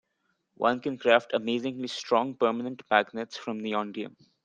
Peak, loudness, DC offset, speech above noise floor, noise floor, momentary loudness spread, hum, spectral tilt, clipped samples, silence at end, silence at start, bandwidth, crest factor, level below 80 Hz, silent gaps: -6 dBFS; -28 LUFS; under 0.1%; 48 dB; -76 dBFS; 12 LU; none; -4.5 dB/octave; under 0.1%; 0.35 s; 0.6 s; 9.2 kHz; 24 dB; -76 dBFS; none